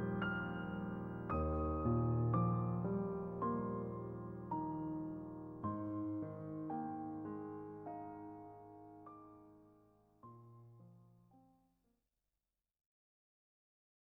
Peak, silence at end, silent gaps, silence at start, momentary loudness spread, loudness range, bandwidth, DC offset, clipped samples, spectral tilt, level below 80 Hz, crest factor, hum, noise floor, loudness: -24 dBFS; 2.75 s; none; 0 s; 22 LU; 20 LU; 3 kHz; under 0.1%; under 0.1%; -11 dB/octave; -58 dBFS; 20 dB; none; under -90 dBFS; -42 LUFS